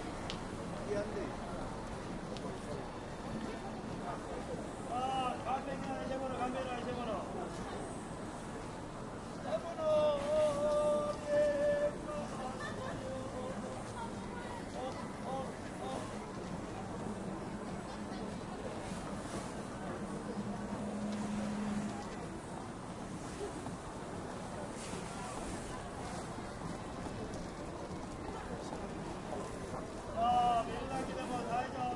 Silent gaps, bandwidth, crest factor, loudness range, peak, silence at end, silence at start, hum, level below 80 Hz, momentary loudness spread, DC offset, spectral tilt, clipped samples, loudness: none; 11.5 kHz; 20 dB; 9 LU; -20 dBFS; 0 s; 0 s; none; -54 dBFS; 11 LU; under 0.1%; -5.5 dB/octave; under 0.1%; -40 LUFS